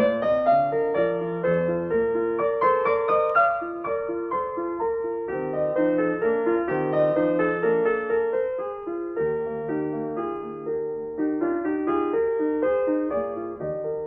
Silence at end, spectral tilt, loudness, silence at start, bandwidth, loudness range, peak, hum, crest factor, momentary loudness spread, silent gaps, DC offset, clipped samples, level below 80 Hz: 0 s; -10 dB/octave; -24 LUFS; 0 s; 4.5 kHz; 5 LU; -10 dBFS; none; 14 dB; 8 LU; none; under 0.1%; under 0.1%; -58 dBFS